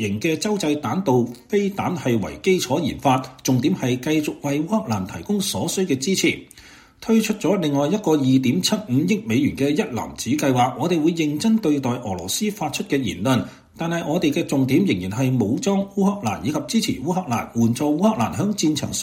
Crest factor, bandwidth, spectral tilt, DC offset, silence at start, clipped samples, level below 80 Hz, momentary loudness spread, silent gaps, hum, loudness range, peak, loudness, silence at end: 16 dB; 16.5 kHz; -5 dB/octave; under 0.1%; 0 s; under 0.1%; -52 dBFS; 5 LU; none; none; 2 LU; -4 dBFS; -21 LUFS; 0 s